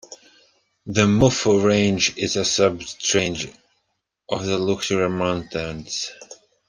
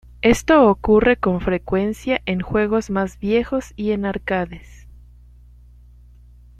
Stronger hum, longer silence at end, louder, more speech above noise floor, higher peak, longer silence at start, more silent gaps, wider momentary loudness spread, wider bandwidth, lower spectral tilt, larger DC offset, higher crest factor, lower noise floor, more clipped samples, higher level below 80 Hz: second, none vs 60 Hz at -40 dBFS; second, 0.35 s vs 1.85 s; about the same, -21 LUFS vs -19 LUFS; first, 54 dB vs 27 dB; about the same, -2 dBFS vs -2 dBFS; second, 0.1 s vs 0.25 s; neither; about the same, 12 LU vs 10 LU; second, 10 kHz vs 14.5 kHz; second, -4 dB/octave vs -6 dB/octave; neither; about the same, 20 dB vs 18 dB; first, -75 dBFS vs -46 dBFS; neither; second, -50 dBFS vs -38 dBFS